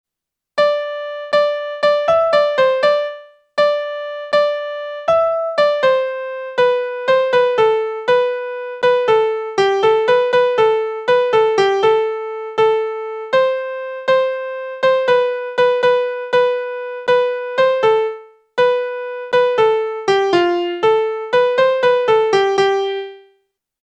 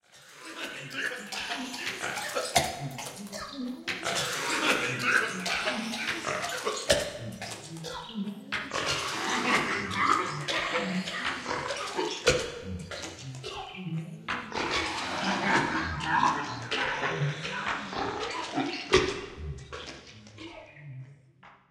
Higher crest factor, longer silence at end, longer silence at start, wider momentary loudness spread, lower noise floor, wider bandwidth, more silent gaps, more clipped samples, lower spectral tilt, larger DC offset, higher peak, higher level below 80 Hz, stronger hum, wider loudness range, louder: second, 14 dB vs 24 dB; first, 0.65 s vs 0.15 s; first, 0.55 s vs 0.15 s; second, 10 LU vs 14 LU; first, -84 dBFS vs -56 dBFS; second, 8.4 kHz vs 16 kHz; neither; neither; about the same, -4 dB/octave vs -3 dB/octave; neither; first, -2 dBFS vs -8 dBFS; second, -60 dBFS vs -54 dBFS; neither; about the same, 2 LU vs 4 LU; first, -16 LUFS vs -30 LUFS